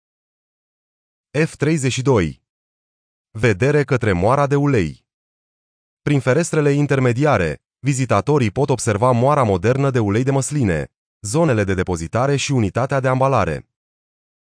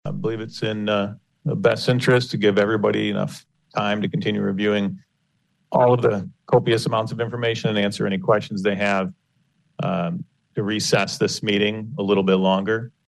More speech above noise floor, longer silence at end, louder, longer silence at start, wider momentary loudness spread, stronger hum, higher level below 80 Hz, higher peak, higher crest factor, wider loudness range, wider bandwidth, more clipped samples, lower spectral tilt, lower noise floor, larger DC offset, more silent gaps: first, over 73 dB vs 48 dB; first, 0.9 s vs 0.2 s; first, -18 LUFS vs -22 LUFS; first, 1.35 s vs 0.05 s; about the same, 8 LU vs 10 LU; neither; first, -44 dBFS vs -60 dBFS; about the same, -4 dBFS vs -6 dBFS; about the same, 16 dB vs 16 dB; about the same, 3 LU vs 3 LU; second, 10.5 kHz vs 12.5 kHz; neither; about the same, -6 dB/octave vs -5.5 dB/octave; first, under -90 dBFS vs -69 dBFS; neither; first, 2.49-3.25 s, 5.14-5.97 s, 10.97-11.20 s vs none